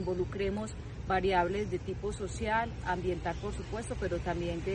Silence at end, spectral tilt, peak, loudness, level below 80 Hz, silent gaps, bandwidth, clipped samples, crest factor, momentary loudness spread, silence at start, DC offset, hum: 0 s; -6 dB/octave; -14 dBFS; -34 LUFS; -44 dBFS; none; 10 kHz; under 0.1%; 18 dB; 9 LU; 0 s; under 0.1%; none